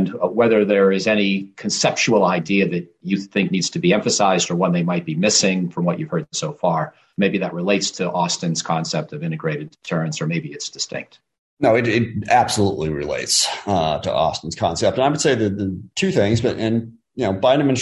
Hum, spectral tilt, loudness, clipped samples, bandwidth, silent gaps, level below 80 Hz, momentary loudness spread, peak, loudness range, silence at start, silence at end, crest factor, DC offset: none; -4.5 dB/octave; -19 LUFS; under 0.1%; 12.5 kHz; 11.39-11.57 s; -48 dBFS; 9 LU; -4 dBFS; 4 LU; 0 s; 0 s; 16 dB; under 0.1%